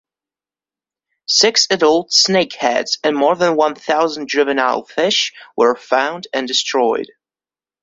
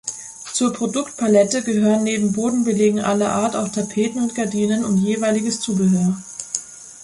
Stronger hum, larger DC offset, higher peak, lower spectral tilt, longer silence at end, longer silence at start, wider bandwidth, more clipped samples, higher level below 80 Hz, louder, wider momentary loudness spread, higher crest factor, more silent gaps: neither; neither; about the same, 0 dBFS vs -2 dBFS; second, -2 dB/octave vs -5 dB/octave; first, 0.75 s vs 0 s; first, 1.3 s vs 0.05 s; second, 8 kHz vs 11.5 kHz; neither; second, -64 dBFS vs -58 dBFS; first, -15 LUFS vs -19 LUFS; second, 6 LU vs 9 LU; about the same, 16 dB vs 18 dB; neither